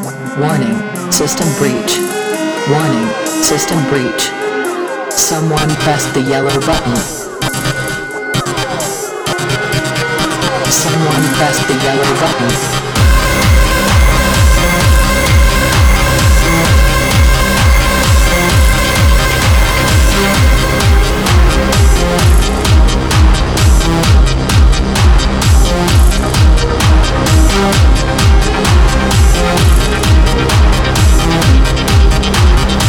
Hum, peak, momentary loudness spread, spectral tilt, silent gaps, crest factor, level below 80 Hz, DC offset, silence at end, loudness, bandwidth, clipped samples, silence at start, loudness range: none; 0 dBFS; 6 LU; -4.5 dB/octave; none; 10 dB; -12 dBFS; under 0.1%; 0 s; -11 LUFS; over 20 kHz; under 0.1%; 0 s; 4 LU